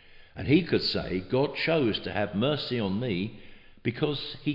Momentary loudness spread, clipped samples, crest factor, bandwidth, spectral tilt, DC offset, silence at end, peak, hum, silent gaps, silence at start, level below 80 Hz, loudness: 9 LU; under 0.1%; 18 dB; 5.8 kHz; -8 dB/octave; under 0.1%; 0 s; -10 dBFS; none; none; 0.1 s; -54 dBFS; -28 LUFS